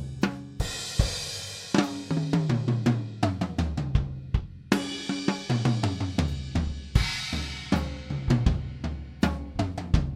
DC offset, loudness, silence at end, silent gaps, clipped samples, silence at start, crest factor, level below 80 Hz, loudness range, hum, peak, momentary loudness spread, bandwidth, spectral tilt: under 0.1%; -29 LUFS; 0 s; none; under 0.1%; 0 s; 24 dB; -34 dBFS; 1 LU; none; -4 dBFS; 7 LU; 15 kHz; -5.5 dB/octave